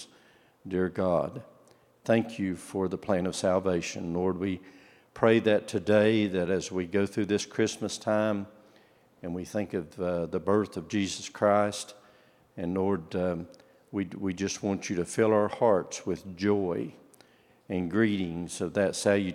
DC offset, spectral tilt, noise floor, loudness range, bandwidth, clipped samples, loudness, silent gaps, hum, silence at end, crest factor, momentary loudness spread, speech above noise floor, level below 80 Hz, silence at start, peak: under 0.1%; -5.5 dB/octave; -61 dBFS; 4 LU; 14.5 kHz; under 0.1%; -29 LUFS; none; none; 0 s; 22 dB; 12 LU; 33 dB; -68 dBFS; 0 s; -6 dBFS